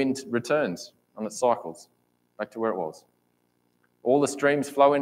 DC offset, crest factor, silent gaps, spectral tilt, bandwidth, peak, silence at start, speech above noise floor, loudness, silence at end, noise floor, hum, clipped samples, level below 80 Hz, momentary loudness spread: under 0.1%; 22 dB; none; -5 dB/octave; 16 kHz; -6 dBFS; 0 s; 45 dB; -26 LUFS; 0 s; -70 dBFS; 60 Hz at -60 dBFS; under 0.1%; -78 dBFS; 15 LU